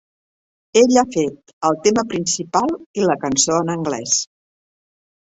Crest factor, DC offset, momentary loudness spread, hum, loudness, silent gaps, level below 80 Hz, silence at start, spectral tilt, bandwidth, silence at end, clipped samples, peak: 18 dB; under 0.1%; 8 LU; none; -18 LUFS; 1.53-1.61 s, 2.86-2.94 s; -56 dBFS; 0.75 s; -3.5 dB/octave; 8.4 kHz; 0.95 s; under 0.1%; -2 dBFS